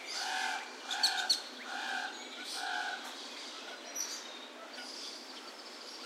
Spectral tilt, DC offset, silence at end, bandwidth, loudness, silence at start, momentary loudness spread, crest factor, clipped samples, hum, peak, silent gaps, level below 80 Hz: 2.5 dB/octave; under 0.1%; 0 s; 16 kHz; -37 LUFS; 0 s; 14 LU; 22 dB; under 0.1%; none; -18 dBFS; none; under -90 dBFS